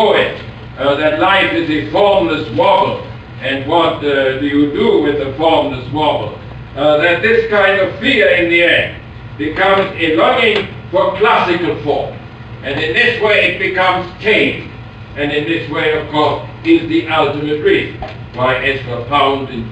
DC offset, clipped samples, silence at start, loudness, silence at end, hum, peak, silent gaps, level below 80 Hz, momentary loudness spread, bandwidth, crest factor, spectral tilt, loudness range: under 0.1%; under 0.1%; 0 s; -13 LUFS; 0 s; none; 0 dBFS; none; -40 dBFS; 13 LU; 9 kHz; 14 dB; -6.5 dB/octave; 3 LU